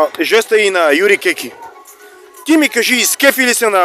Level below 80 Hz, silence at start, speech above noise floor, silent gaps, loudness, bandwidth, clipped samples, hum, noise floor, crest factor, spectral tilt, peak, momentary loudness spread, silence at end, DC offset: -64 dBFS; 0 s; 27 dB; none; -11 LUFS; 15 kHz; under 0.1%; none; -39 dBFS; 14 dB; -1 dB/octave; 0 dBFS; 8 LU; 0 s; under 0.1%